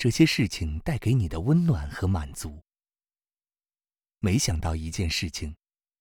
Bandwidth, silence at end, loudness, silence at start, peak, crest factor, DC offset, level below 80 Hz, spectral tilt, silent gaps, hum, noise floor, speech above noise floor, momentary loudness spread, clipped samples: 19.5 kHz; 0.45 s; -26 LUFS; 0 s; -6 dBFS; 20 dB; under 0.1%; -42 dBFS; -5.5 dB/octave; none; none; under -90 dBFS; over 65 dB; 14 LU; under 0.1%